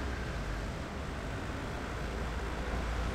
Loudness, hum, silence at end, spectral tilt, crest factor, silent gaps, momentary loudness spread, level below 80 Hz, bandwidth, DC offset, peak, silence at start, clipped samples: -38 LUFS; none; 0 s; -5.5 dB/octave; 14 dB; none; 3 LU; -40 dBFS; 14.5 kHz; under 0.1%; -22 dBFS; 0 s; under 0.1%